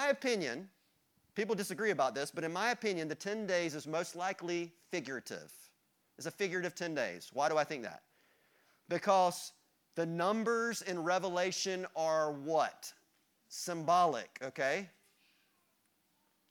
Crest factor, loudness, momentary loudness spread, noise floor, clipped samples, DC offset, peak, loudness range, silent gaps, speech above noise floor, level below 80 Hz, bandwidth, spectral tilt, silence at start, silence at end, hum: 20 dB; -35 LUFS; 14 LU; -76 dBFS; under 0.1%; under 0.1%; -16 dBFS; 5 LU; none; 41 dB; -86 dBFS; 19.5 kHz; -3.5 dB/octave; 0 s; 1.6 s; none